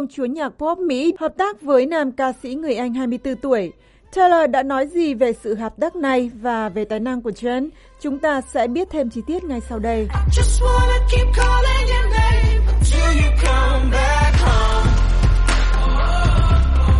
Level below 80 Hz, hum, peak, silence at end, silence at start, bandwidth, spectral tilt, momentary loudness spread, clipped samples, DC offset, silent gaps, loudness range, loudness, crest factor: -18 dBFS; none; -4 dBFS; 0 s; 0 s; 11.5 kHz; -6 dB/octave; 8 LU; under 0.1%; under 0.1%; none; 5 LU; -19 LUFS; 14 dB